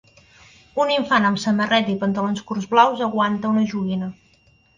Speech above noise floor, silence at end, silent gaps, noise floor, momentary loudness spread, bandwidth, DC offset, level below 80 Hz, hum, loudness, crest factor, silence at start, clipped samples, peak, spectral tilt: 38 dB; 0.65 s; none; -57 dBFS; 9 LU; 7.6 kHz; under 0.1%; -60 dBFS; none; -20 LUFS; 18 dB; 0.75 s; under 0.1%; -2 dBFS; -5.5 dB/octave